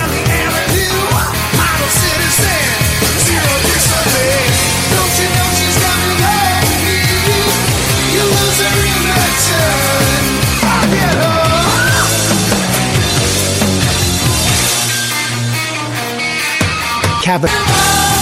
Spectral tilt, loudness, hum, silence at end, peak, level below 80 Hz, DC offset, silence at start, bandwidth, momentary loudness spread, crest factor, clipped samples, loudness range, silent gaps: -3 dB/octave; -11 LUFS; none; 0 s; 0 dBFS; -26 dBFS; under 0.1%; 0 s; 16.5 kHz; 3 LU; 12 dB; under 0.1%; 2 LU; none